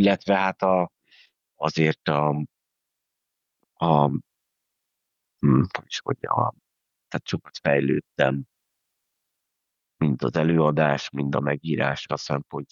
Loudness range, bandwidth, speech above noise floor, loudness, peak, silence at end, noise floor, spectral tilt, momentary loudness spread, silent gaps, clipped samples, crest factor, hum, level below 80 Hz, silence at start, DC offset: 3 LU; 7.4 kHz; 60 dB; -24 LUFS; -4 dBFS; 0.05 s; -83 dBFS; -7 dB/octave; 10 LU; none; under 0.1%; 22 dB; none; -60 dBFS; 0 s; under 0.1%